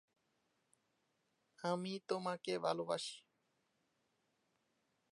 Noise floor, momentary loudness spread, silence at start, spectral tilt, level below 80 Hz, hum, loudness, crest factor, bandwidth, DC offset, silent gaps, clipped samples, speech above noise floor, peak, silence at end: -83 dBFS; 7 LU; 1.6 s; -4.5 dB/octave; under -90 dBFS; none; -42 LUFS; 24 dB; 11.5 kHz; under 0.1%; none; under 0.1%; 42 dB; -22 dBFS; 1.95 s